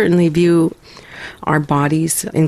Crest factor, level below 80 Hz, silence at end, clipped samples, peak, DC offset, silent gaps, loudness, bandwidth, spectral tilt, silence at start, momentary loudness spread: 14 dB; -46 dBFS; 0 s; under 0.1%; -2 dBFS; under 0.1%; none; -15 LUFS; 15.5 kHz; -6 dB/octave; 0 s; 19 LU